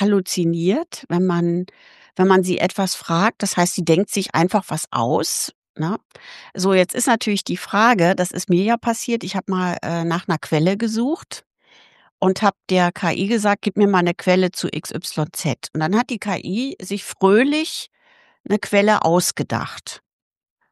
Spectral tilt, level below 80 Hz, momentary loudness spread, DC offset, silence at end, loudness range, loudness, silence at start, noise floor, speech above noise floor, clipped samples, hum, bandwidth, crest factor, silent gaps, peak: -5 dB/octave; -64 dBFS; 10 LU; under 0.1%; 0.75 s; 3 LU; -19 LUFS; 0 s; -53 dBFS; 34 dB; under 0.1%; none; 12.5 kHz; 18 dB; 5.55-5.62 s, 5.69-5.74 s, 6.05-6.10 s, 12.11-12.18 s, 18.40-18.44 s; -2 dBFS